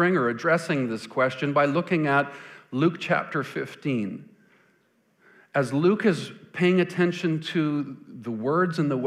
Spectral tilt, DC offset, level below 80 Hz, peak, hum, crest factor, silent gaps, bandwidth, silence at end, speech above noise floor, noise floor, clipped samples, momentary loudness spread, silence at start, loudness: -7 dB/octave; under 0.1%; -76 dBFS; -8 dBFS; none; 16 dB; none; 12.5 kHz; 0 s; 41 dB; -66 dBFS; under 0.1%; 12 LU; 0 s; -25 LUFS